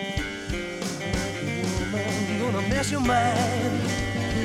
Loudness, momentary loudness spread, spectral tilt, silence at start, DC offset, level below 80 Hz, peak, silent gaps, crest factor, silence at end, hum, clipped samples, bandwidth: -26 LUFS; 8 LU; -5 dB/octave; 0 s; under 0.1%; -40 dBFS; -10 dBFS; none; 16 dB; 0 s; none; under 0.1%; 15.5 kHz